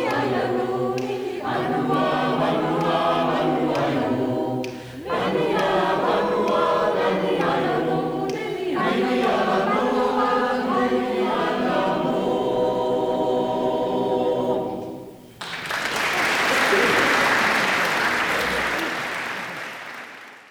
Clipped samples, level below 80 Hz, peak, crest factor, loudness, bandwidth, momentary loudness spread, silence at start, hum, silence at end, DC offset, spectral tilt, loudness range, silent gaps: under 0.1%; -54 dBFS; -6 dBFS; 16 dB; -22 LUFS; over 20 kHz; 10 LU; 0 s; none; 0.1 s; under 0.1%; -4.5 dB/octave; 3 LU; none